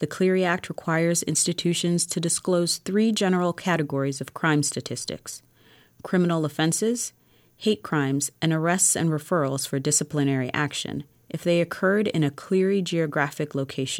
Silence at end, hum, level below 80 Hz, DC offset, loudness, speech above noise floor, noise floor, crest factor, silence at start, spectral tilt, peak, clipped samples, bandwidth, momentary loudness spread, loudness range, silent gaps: 0 s; none; -68 dBFS; under 0.1%; -24 LUFS; 32 dB; -56 dBFS; 16 dB; 0 s; -4 dB/octave; -8 dBFS; under 0.1%; 16.5 kHz; 8 LU; 3 LU; none